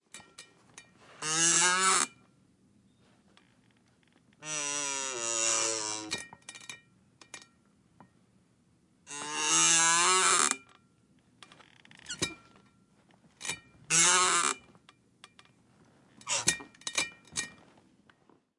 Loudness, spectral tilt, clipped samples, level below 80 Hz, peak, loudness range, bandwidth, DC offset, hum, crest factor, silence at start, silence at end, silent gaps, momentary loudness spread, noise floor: -27 LUFS; 0 dB/octave; under 0.1%; -74 dBFS; -10 dBFS; 11 LU; 11.5 kHz; under 0.1%; none; 24 dB; 0.15 s; 1.1 s; none; 24 LU; -67 dBFS